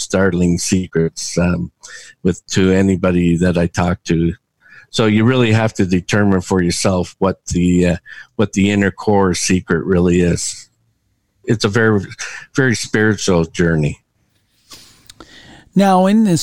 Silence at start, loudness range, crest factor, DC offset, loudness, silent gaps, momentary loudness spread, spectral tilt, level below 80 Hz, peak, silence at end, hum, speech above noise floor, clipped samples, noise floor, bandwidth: 0 s; 2 LU; 14 dB; 0.7%; -16 LUFS; none; 9 LU; -5.5 dB/octave; -40 dBFS; 0 dBFS; 0 s; none; 49 dB; under 0.1%; -64 dBFS; 12.5 kHz